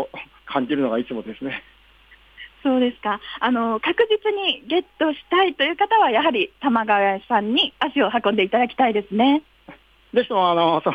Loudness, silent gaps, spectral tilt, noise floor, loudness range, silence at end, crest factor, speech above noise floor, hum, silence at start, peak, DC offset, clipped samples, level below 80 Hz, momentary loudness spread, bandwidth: -20 LUFS; none; -6.5 dB/octave; -52 dBFS; 5 LU; 0 s; 16 dB; 32 dB; none; 0 s; -6 dBFS; under 0.1%; under 0.1%; -60 dBFS; 9 LU; 6 kHz